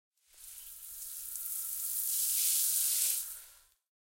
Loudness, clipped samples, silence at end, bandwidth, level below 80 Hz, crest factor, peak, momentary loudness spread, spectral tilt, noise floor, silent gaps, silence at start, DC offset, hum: -30 LUFS; under 0.1%; 0.5 s; 17 kHz; -72 dBFS; 24 dB; -12 dBFS; 19 LU; 5 dB/octave; -59 dBFS; none; 0.35 s; under 0.1%; none